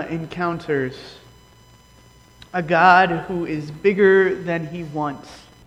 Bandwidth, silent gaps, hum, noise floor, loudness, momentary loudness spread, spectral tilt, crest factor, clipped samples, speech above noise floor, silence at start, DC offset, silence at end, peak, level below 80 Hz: 9.6 kHz; none; none; -50 dBFS; -19 LUFS; 16 LU; -7 dB/octave; 20 dB; under 0.1%; 31 dB; 0 s; under 0.1%; 0.25 s; 0 dBFS; -52 dBFS